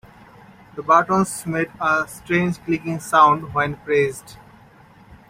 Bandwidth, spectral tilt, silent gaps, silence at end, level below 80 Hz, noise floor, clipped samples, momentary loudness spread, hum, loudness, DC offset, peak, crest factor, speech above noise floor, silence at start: 16 kHz; -5.5 dB/octave; none; 0.15 s; -54 dBFS; -48 dBFS; under 0.1%; 10 LU; none; -19 LUFS; under 0.1%; -2 dBFS; 20 dB; 29 dB; 0.75 s